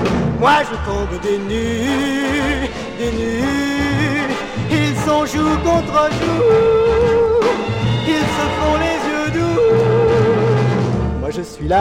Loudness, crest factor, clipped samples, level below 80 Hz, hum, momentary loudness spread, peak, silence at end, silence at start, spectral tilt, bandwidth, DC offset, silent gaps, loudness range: -16 LUFS; 14 dB; under 0.1%; -32 dBFS; none; 8 LU; 0 dBFS; 0 s; 0 s; -6 dB/octave; 16 kHz; under 0.1%; none; 4 LU